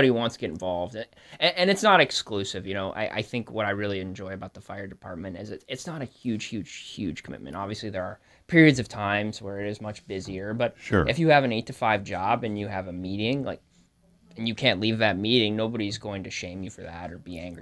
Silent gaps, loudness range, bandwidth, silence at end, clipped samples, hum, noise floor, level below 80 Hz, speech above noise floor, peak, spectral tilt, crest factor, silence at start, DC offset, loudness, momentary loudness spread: none; 10 LU; 11 kHz; 0 s; under 0.1%; none; -61 dBFS; -54 dBFS; 34 dB; -4 dBFS; -5 dB/octave; 24 dB; 0 s; under 0.1%; -26 LUFS; 18 LU